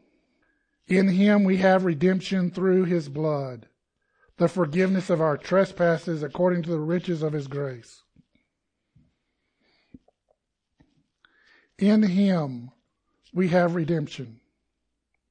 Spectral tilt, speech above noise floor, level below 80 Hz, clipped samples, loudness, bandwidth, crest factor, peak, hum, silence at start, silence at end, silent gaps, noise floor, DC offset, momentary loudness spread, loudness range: -8 dB/octave; 56 dB; -64 dBFS; under 0.1%; -24 LUFS; 9.4 kHz; 18 dB; -8 dBFS; none; 0.9 s; 1 s; none; -79 dBFS; under 0.1%; 14 LU; 9 LU